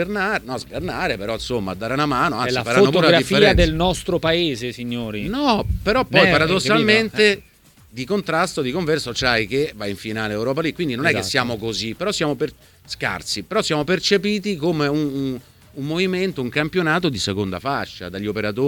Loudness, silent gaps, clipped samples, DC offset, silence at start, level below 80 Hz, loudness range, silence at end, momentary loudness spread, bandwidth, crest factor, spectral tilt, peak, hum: -20 LUFS; none; under 0.1%; under 0.1%; 0 s; -38 dBFS; 5 LU; 0 s; 12 LU; 19 kHz; 20 dB; -4.5 dB/octave; 0 dBFS; none